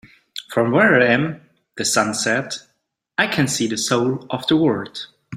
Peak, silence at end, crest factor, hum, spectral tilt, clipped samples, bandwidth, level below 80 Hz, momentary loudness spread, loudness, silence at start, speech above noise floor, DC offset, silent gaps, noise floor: -2 dBFS; 0 s; 18 dB; none; -4 dB/octave; under 0.1%; 16 kHz; -60 dBFS; 17 LU; -19 LUFS; 0.35 s; 51 dB; under 0.1%; none; -70 dBFS